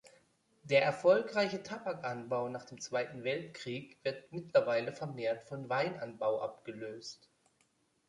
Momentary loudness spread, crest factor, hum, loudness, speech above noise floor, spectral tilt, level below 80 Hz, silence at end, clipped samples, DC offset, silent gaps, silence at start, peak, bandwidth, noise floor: 15 LU; 20 dB; none; -35 LUFS; 40 dB; -5 dB/octave; -78 dBFS; 0.95 s; under 0.1%; under 0.1%; none; 0.65 s; -16 dBFS; 11 kHz; -75 dBFS